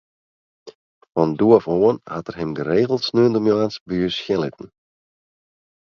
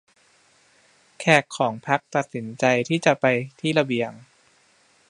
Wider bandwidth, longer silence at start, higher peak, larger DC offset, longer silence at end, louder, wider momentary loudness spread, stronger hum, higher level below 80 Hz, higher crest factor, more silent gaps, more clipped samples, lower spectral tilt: second, 7 kHz vs 11 kHz; second, 0.65 s vs 1.2 s; about the same, 0 dBFS vs 0 dBFS; neither; first, 1.3 s vs 0.9 s; first, -19 LUFS vs -22 LUFS; first, 12 LU vs 8 LU; neither; first, -54 dBFS vs -70 dBFS; about the same, 20 dB vs 24 dB; first, 0.75-1.01 s, 3.80-3.86 s vs none; neither; first, -7 dB/octave vs -5 dB/octave